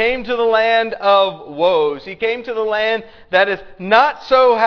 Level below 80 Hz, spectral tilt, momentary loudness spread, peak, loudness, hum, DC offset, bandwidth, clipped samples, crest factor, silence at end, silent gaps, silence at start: -48 dBFS; -5 dB/octave; 8 LU; 0 dBFS; -16 LUFS; none; under 0.1%; 5.4 kHz; under 0.1%; 16 dB; 0 s; none; 0 s